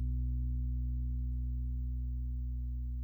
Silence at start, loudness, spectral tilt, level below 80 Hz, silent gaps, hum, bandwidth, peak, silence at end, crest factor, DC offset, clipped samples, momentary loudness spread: 0 s; -38 LUFS; -12 dB/octave; -36 dBFS; none; 60 Hz at -75 dBFS; 0.4 kHz; -28 dBFS; 0 s; 8 dB; under 0.1%; under 0.1%; 3 LU